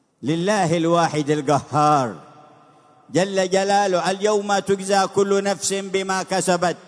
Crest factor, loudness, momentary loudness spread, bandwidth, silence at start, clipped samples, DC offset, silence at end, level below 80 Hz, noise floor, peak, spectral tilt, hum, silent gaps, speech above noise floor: 16 dB; -20 LUFS; 5 LU; 11 kHz; 0.2 s; under 0.1%; under 0.1%; 0.1 s; -66 dBFS; -52 dBFS; -4 dBFS; -4.5 dB/octave; none; none; 32 dB